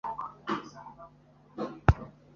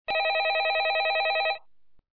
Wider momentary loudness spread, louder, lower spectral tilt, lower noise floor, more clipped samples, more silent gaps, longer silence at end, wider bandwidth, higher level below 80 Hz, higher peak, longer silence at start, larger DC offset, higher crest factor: first, 22 LU vs 4 LU; second, -32 LUFS vs -25 LUFS; first, -6.5 dB/octave vs -2.5 dB/octave; about the same, -58 dBFS vs -58 dBFS; neither; neither; second, 0.25 s vs 0.55 s; first, 7.2 kHz vs 5.2 kHz; first, -40 dBFS vs -68 dBFS; first, -2 dBFS vs -18 dBFS; about the same, 0.05 s vs 0.1 s; second, under 0.1% vs 0.3%; first, 30 dB vs 10 dB